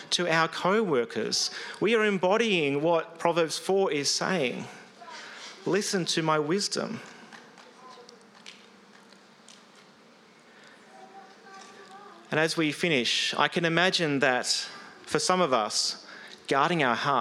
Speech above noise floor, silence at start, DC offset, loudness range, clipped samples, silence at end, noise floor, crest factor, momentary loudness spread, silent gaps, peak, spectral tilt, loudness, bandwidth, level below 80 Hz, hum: 29 dB; 0 s; under 0.1%; 8 LU; under 0.1%; 0 s; -56 dBFS; 22 dB; 20 LU; none; -8 dBFS; -3.5 dB/octave; -26 LUFS; 15 kHz; -78 dBFS; none